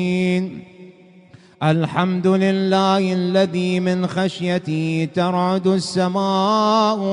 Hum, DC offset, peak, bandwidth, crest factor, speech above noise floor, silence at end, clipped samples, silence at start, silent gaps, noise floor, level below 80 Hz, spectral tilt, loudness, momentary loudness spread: none; under 0.1%; -4 dBFS; 10.5 kHz; 16 dB; 29 dB; 0 s; under 0.1%; 0 s; none; -47 dBFS; -60 dBFS; -6.5 dB/octave; -19 LUFS; 5 LU